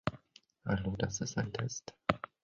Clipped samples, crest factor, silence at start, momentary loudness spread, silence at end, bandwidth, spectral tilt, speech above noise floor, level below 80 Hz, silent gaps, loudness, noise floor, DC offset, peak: under 0.1%; 30 dB; 0.05 s; 6 LU; 0.25 s; 7.6 kHz; -5.5 dB/octave; 28 dB; -56 dBFS; none; -37 LUFS; -64 dBFS; under 0.1%; -8 dBFS